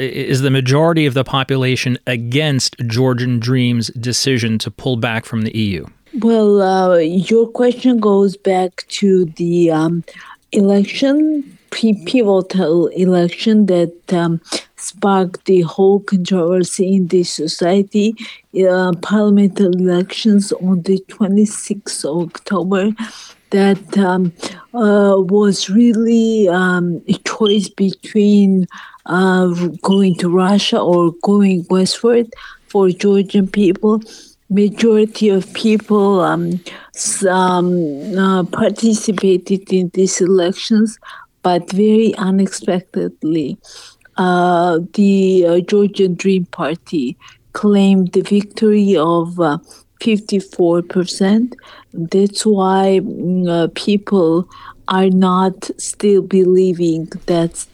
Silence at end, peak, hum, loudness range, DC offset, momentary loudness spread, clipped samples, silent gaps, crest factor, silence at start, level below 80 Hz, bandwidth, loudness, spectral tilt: 0.1 s; -4 dBFS; none; 3 LU; under 0.1%; 8 LU; under 0.1%; none; 10 dB; 0 s; -54 dBFS; 12.5 kHz; -15 LUFS; -6 dB/octave